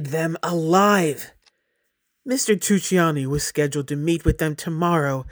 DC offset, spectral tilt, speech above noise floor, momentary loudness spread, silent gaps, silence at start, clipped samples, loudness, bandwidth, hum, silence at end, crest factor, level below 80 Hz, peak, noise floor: under 0.1%; -5 dB/octave; 52 dB; 8 LU; none; 0 s; under 0.1%; -21 LUFS; over 20 kHz; none; 0 s; 18 dB; -40 dBFS; -4 dBFS; -73 dBFS